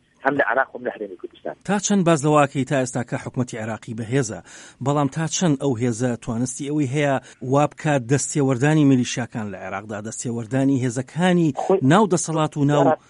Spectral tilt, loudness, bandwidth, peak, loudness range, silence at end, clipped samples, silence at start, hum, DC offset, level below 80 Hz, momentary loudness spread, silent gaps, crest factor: -5.5 dB/octave; -21 LUFS; 11 kHz; -4 dBFS; 3 LU; 0.15 s; under 0.1%; 0.25 s; none; under 0.1%; -58 dBFS; 13 LU; none; 18 dB